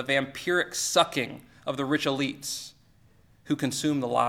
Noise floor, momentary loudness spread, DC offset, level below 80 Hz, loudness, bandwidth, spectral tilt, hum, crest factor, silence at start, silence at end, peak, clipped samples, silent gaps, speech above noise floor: -59 dBFS; 12 LU; under 0.1%; -66 dBFS; -28 LUFS; 17 kHz; -3.5 dB/octave; none; 22 dB; 0 s; 0 s; -6 dBFS; under 0.1%; none; 32 dB